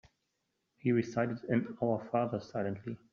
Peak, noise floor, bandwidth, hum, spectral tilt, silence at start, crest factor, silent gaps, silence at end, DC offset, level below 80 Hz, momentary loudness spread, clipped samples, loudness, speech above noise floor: -18 dBFS; -82 dBFS; 7.2 kHz; none; -7.5 dB/octave; 0.85 s; 18 dB; none; 0.15 s; under 0.1%; -72 dBFS; 6 LU; under 0.1%; -34 LUFS; 49 dB